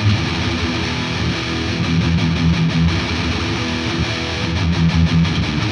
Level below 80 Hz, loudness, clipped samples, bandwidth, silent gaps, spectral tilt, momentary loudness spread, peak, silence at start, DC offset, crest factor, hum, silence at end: -30 dBFS; -18 LUFS; under 0.1%; 9.8 kHz; none; -5.5 dB/octave; 4 LU; -4 dBFS; 0 s; under 0.1%; 14 dB; none; 0 s